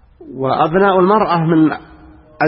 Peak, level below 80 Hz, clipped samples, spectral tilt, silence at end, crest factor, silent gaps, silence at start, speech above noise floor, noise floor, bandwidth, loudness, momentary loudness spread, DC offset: 0 dBFS; -46 dBFS; under 0.1%; -12.5 dB/octave; 0 s; 14 dB; none; 0.2 s; 28 dB; -41 dBFS; 5.6 kHz; -14 LUFS; 13 LU; under 0.1%